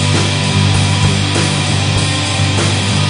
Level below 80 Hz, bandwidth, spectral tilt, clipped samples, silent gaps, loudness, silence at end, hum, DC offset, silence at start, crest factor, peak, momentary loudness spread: -34 dBFS; 10.5 kHz; -4 dB/octave; under 0.1%; none; -13 LUFS; 0 s; 50 Hz at -30 dBFS; under 0.1%; 0 s; 12 dB; 0 dBFS; 2 LU